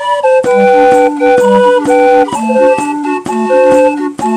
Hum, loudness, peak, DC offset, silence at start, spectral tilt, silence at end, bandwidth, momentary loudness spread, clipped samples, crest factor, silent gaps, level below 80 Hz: none; -9 LUFS; 0 dBFS; under 0.1%; 0 s; -5 dB/octave; 0 s; 11 kHz; 8 LU; 0.8%; 8 dB; none; -48 dBFS